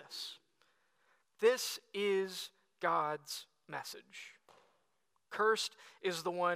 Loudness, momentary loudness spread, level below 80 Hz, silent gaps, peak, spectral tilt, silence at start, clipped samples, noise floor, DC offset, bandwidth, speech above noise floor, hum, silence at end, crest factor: -37 LUFS; 17 LU; under -90 dBFS; none; -16 dBFS; -2.5 dB/octave; 0 s; under 0.1%; -82 dBFS; under 0.1%; 15.5 kHz; 45 dB; none; 0 s; 22 dB